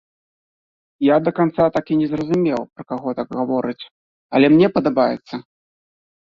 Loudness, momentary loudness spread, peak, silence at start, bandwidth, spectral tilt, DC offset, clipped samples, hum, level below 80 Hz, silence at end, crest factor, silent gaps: -18 LUFS; 14 LU; -2 dBFS; 1 s; 7 kHz; -8.5 dB/octave; under 0.1%; under 0.1%; none; -56 dBFS; 0.9 s; 18 dB; 3.91-4.29 s